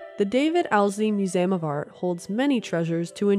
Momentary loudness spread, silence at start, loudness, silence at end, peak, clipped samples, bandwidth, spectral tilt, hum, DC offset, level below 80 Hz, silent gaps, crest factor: 7 LU; 0 s; -24 LUFS; 0 s; -8 dBFS; under 0.1%; 13 kHz; -6 dB/octave; none; under 0.1%; -72 dBFS; none; 16 dB